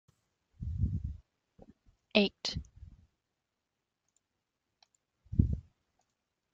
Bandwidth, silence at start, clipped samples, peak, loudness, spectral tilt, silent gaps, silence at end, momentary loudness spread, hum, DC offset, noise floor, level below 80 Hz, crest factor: 7.6 kHz; 0.6 s; under 0.1%; -8 dBFS; -34 LUFS; -6 dB/octave; none; 0.9 s; 16 LU; none; under 0.1%; -87 dBFS; -46 dBFS; 30 dB